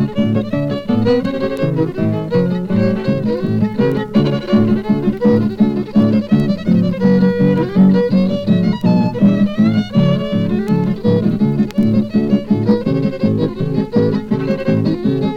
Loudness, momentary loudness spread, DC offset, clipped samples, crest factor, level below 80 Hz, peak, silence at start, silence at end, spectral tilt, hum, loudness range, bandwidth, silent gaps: -15 LUFS; 5 LU; under 0.1%; under 0.1%; 12 dB; -40 dBFS; -2 dBFS; 0 s; 0 s; -9 dB/octave; none; 3 LU; 6.6 kHz; none